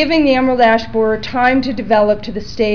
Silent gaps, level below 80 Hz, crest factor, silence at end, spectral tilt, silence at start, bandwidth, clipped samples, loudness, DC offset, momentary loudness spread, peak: none; -38 dBFS; 12 dB; 0 s; -6 dB/octave; 0 s; 5.4 kHz; under 0.1%; -14 LUFS; 3%; 7 LU; -2 dBFS